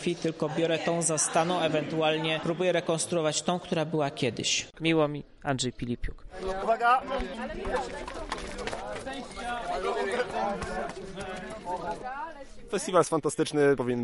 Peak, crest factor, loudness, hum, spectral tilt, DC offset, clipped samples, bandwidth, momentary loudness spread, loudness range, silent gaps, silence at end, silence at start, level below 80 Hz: -10 dBFS; 20 dB; -29 LUFS; none; -4 dB/octave; under 0.1%; under 0.1%; 11.5 kHz; 12 LU; 6 LU; none; 0 s; 0 s; -48 dBFS